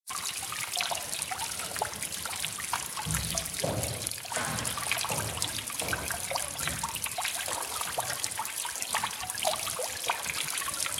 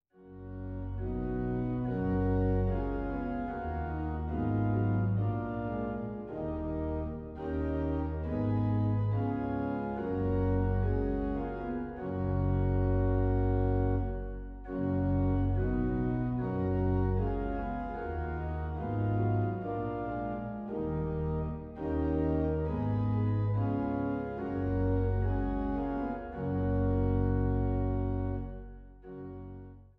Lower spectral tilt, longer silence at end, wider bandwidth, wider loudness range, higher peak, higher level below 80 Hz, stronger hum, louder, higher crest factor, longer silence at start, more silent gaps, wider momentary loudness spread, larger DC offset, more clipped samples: second, -1.5 dB/octave vs -12 dB/octave; second, 0 s vs 0.15 s; first, 18 kHz vs 4 kHz; about the same, 1 LU vs 3 LU; first, -10 dBFS vs -18 dBFS; second, -54 dBFS vs -40 dBFS; neither; about the same, -31 LUFS vs -33 LUFS; first, 24 dB vs 14 dB; second, 0.05 s vs 0.2 s; neither; second, 3 LU vs 9 LU; neither; neither